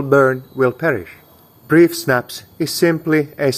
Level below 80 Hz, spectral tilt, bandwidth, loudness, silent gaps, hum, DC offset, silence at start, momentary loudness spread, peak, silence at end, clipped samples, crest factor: -56 dBFS; -5.5 dB/octave; 16 kHz; -16 LUFS; none; none; under 0.1%; 0 s; 10 LU; 0 dBFS; 0 s; under 0.1%; 16 dB